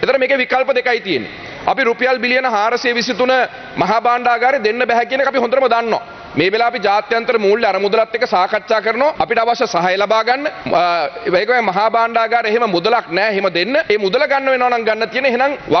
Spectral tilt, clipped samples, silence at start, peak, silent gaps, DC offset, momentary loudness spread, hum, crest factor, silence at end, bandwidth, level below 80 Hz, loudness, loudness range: -4.5 dB/octave; under 0.1%; 0 s; 0 dBFS; none; under 0.1%; 3 LU; none; 14 dB; 0 s; 6.4 kHz; -54 dBFS; -15 LUFS; 1 LU